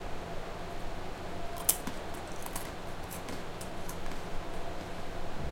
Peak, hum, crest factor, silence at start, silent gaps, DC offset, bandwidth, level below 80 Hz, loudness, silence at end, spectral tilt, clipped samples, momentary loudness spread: -8 dBFS; none; 28 dB; 0 s; none; under 0.1%; 17 kHz; -42 dBFS; -38 LUFS; 0 s; -3 dB/octave; under 0.1%; 12 LU